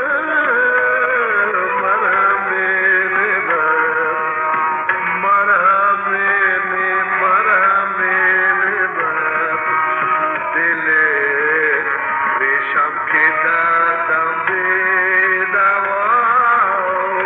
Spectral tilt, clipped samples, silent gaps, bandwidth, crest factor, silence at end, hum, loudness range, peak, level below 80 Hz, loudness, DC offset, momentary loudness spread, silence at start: -6.5 dB/octave; under 0.1%; none; 4.2 kHz; 12 dB; 0 s; none; 1 LU; -2 dBFS; -66 dBFS; -14 LUFS; under 0.1%; 4 LU; 0 s